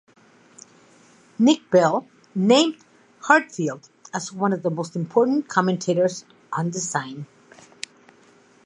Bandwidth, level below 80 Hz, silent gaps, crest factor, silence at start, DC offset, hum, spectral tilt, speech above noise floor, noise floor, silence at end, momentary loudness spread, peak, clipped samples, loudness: 11 kHz; -74 dBFS; none; 22 dB; 1.4 s; under 0.1%; none; -4.5 dB/octave; 34 dB; -55 dBFS; 1.4 s; 19 LU; -2 dBFS; under 0.1%; -22 LUFS